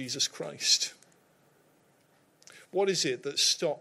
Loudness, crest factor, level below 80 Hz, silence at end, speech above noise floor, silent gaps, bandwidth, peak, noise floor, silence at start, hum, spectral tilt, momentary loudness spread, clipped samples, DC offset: -28 LUFS; 22 dB; -84 dBFS; 0 s; 36 dB; none; 16 kHz; -10 dBFS; -66 dBFS; 0 s; none; -1.5 dB/octave; 6 LU; under 0.1%; under 0.1%